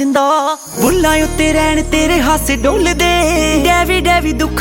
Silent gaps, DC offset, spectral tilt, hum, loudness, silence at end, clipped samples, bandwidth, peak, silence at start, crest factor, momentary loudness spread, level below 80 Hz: none; under 0.1%; -4 dB/octave; none; -12 LUFS; 0 s; under 0.1%; 17 kHz; 0 dBFS; 0 s; 12 dB; 3 LU; -22 dBFS